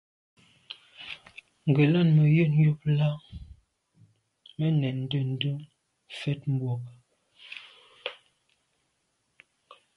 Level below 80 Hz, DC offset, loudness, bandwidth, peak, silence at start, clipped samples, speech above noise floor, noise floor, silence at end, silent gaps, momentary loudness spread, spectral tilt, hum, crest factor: -60 dBFS; under 0.1%; -26 LUFS; 5.2 kHz; -10 dBFS; 0.7 s; under 0.1%; 51 dB; -75 dBFS; 1.85 s; none; 23 LU; -9 dB/octave; none; 18 dB